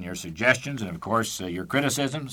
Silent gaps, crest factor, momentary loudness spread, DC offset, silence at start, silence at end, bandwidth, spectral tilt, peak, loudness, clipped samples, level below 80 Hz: none; 22 dB; 10 LU; under 0.1%; 0 s; 0 s; 19 kHz; -4 dB/octave; -4 dBFS; -26 LUFS; under 0.1%; -56 dBFS